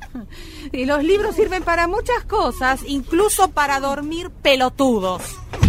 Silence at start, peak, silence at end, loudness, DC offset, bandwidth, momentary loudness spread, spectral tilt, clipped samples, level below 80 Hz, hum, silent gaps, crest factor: 0 s; 0 dBFS; 0 s; -19 LUFS; under 0.1%; 16 kHz; 13 LU; -4.5 dB/octave; under 0.1%; -34 dBFS; none; none; 18 dB